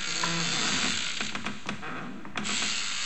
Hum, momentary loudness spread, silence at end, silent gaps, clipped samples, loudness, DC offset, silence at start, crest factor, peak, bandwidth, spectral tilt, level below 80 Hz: none; 11 LU; 0 s; none; under 0.1%; -29 LUFS; 2%; 0 s; 18 dB; -12 dBFS; 15 kHz; -1.5 dB/octave; -60 dBFS